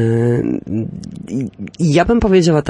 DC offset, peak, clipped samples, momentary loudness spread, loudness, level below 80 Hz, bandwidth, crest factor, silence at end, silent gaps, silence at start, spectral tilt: under 0.1%; -2 dBFS; under 0.1%; 14 LU; -16 LUFS; -34 dBFS; 11 kHz; 14 dB; 0 s; none; 0 s; -7 dB/octave